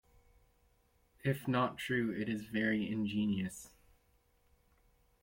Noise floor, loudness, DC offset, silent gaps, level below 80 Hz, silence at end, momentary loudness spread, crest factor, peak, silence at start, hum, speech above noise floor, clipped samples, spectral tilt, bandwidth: -72 dBFS; -36 LUFS; under 0.1%; none; -68 dBFS; 1.55 s; 6 LU; 18 dB; -20 dBFS; 1.25 s; none; 37 dB; under 0.1%; -6 dB/octave; 16.5 kHz